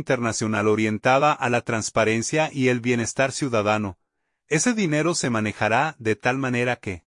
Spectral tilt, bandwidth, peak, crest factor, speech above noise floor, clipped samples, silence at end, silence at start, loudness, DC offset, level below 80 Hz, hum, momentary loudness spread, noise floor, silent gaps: -4.5 dB/octave; 11 kHz; -6 dBFS; 18 dB; 49 dB; under 0.1%; 0.15 s; 0 s; -22 LUFS; under 0.1%; -60 dBFS; none; 4 LU; -71 dBFS; none